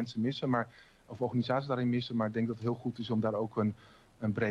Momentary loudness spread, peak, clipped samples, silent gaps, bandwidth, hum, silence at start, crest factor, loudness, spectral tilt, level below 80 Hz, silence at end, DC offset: 7 LU; -18 dBFS; under 0.1%; none; 7.8 kHz; none; 0 s; 16 dB; -34 LUFS; -8 dB/octave; -68 dBFS; 0 s; under 0.1%